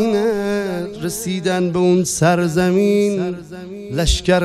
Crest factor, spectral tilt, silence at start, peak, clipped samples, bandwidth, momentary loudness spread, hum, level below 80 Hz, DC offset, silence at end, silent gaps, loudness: 16 dB; -5 dB/octave; 0 s; -2 dBFS; under 0.1%; 14.5 kHz; 10 LU; none; -32 dBFS; under 0.1%; 0 s; none; -18 LUFS